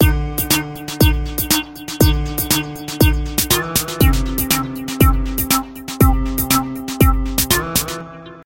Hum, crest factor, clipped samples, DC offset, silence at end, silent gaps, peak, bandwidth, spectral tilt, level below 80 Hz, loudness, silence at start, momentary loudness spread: none; 16 dB; under 0.1%; under 0.1%; 0.05 s; none; 0 dBFS; 17.5 kHz; -4 dB/octave; -22 dBFS; -17 LUFS; 0 s; 9 LU